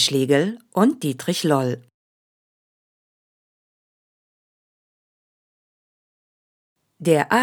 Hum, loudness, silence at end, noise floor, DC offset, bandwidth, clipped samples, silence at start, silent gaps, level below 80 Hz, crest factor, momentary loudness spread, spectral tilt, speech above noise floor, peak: none; -21 LUFS; 0 s; under -90 dBFS; under 0.1%; over 20 kHz; under 0.1%; 0 s; 1.94-6.76 s; -80 dBFS; 22 dB; 9 LU; -4.5 dB/octave; over 70 dB; -2 dBFS